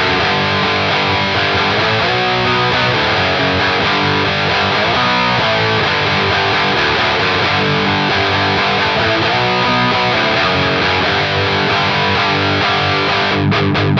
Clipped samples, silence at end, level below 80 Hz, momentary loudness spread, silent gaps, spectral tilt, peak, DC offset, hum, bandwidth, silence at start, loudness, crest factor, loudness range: under 0.1%; 0 s; -40 dBFS; 1 LU; none; -5 dB/octave; -2 dBFS; under 0.1%; none; 7.8 kHz; 0 s; -13 LUFS; 12 dB; 0 LU